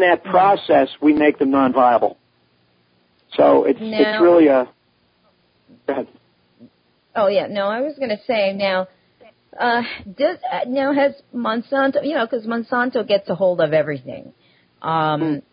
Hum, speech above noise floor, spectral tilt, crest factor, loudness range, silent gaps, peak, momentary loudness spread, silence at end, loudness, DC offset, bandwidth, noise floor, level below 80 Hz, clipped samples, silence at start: none; 44 dB; -10.5 dB/octave; 16 dB; 5 LU; none; -2 dBFS; 12 LU; 0.1 s; -18 LUFS; under 0.1%; 5.2 kHz; -62 dBFS; -62 dBFS; under 0.1%; 0 s